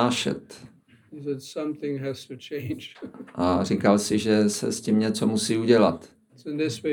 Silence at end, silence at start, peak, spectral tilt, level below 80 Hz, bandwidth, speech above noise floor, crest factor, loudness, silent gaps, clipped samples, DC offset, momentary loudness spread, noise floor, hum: 0 s; 0 s; -4 dBFS; -5 dB/octave; -66 dBFS; 19 kHz; 23 dB; 20 dB; -25 LUFS; none; under 0.1%; under 0.1%; 17 LU; -48 dBFS; none